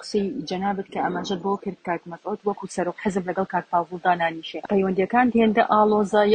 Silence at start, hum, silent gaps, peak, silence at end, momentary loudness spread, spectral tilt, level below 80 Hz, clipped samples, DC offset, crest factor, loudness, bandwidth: 0 s; none; none; -6 dBFS; 0 s; 10 LU; -6 dB/octave; -60 dBFS; under 0.1%; under 0.1%; 18 dB; -23 LUFS; 9.4 kHz